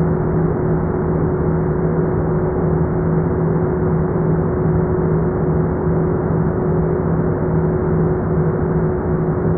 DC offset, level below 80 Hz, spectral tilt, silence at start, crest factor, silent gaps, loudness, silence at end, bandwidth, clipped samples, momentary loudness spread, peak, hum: under 0.1%; -30 dBFS; -14 dB/octave; 0 s; 12 dB; none; -18 LUFS; 0 s; 2.4 kHz; under 0.1%; 1 LU; -4 dBFS; none